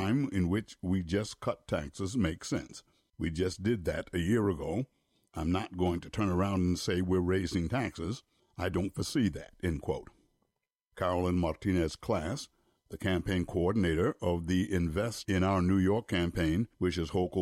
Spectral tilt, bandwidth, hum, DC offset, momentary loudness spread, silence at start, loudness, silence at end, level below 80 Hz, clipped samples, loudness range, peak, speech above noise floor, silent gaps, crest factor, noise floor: -6.5 dB/octave; 15.5 kHz; none; under 0.1%; 8 LU; 0 s; -32 LUFS; 0 s; -50 dBFS; under 0.1%; 4 LU; -18 dBFS; 52 dB; none; 14 dB; -83 dBFS